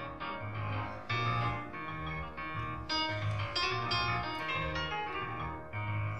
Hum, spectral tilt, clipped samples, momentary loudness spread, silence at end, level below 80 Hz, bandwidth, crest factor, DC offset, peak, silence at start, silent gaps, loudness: none; -5.5 dB/octave; under 0.1%; 8 LU; 0 s; -52 dBFS; 8.6 kHz; 16 dB; 0.3%; -20 dBFS; 0 s; none; -35 LUFS